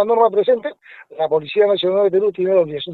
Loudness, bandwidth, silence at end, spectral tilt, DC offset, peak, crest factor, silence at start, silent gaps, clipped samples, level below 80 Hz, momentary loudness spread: -17 LUFS; 4.5 kHz; 0 s; -8 dB/octave; under 0.1%; -2 dBFS; 14 dB; 0 s; none; under 0.1%; -64 dBFS; 8 LU